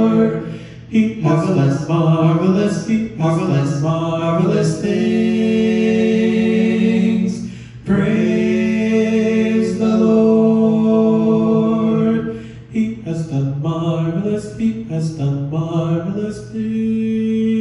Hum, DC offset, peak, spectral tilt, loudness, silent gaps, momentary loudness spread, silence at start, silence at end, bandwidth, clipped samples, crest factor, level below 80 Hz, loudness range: none; under 0.1%; -2 dBFS; -8 dB/octave; -16 LUFS; none; 8 LU; 0 s; 0 s; 11 kHz; under 0.1%; 14 dB; -46 dBFS; 6 LU